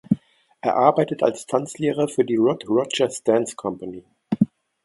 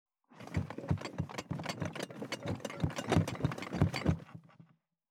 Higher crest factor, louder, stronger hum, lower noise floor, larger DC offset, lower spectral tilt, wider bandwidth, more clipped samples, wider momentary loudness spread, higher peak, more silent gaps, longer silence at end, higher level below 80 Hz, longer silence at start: about the same, 22 dB vs 22 dB; first, -22 LUFS vs -37 LUFS; neither; second, -44 dBFS vs -64 dBFS; neither; about the same, -5.5 dB/octave vs -6 dB/octave; second, 11.5 kHz vs 15 kHz; neither; about the same, 11 LU vs 9 LU; first, 0 dBFS vs -14 dBFS; neither; about the same, 0.4 s vs 0.45 s; second, -64 dBFS vs -56 dBFS; second, 0.1 s vs 0.3 s